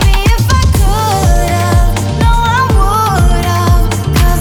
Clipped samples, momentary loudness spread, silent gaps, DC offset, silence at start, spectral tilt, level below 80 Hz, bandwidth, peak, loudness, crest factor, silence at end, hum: under 0.1%; 2 LU; none; under 0.1%; 0 s; -5 dB/octave; -12 dBFS; 19.5 kHz; 0 dBFS; -11 LUFS; 8 dB; 0 s; none